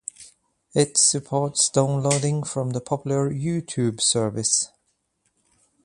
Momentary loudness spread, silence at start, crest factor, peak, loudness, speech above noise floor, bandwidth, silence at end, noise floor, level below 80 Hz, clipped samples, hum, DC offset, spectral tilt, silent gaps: 9 LU; 0.2 s; 20 dB; -4 dBFS; -22 LUFS; 49 dB; 11.5 kHz; 1.2 s; -72 dBFS; -60 dBFS; under 0.1%; none; under 0.1%; -4 dB/octave; none